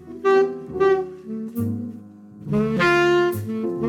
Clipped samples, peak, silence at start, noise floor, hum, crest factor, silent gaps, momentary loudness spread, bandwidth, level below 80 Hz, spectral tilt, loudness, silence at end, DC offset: under 0.1%; -8 dBFS; 0 s; -41 dBFS; none; 14 dB; none; 15 LU; 17.5 kHz; -54 dBFS; -6.5 dB/octave; -21 LUFS; 0 s; under 0.1%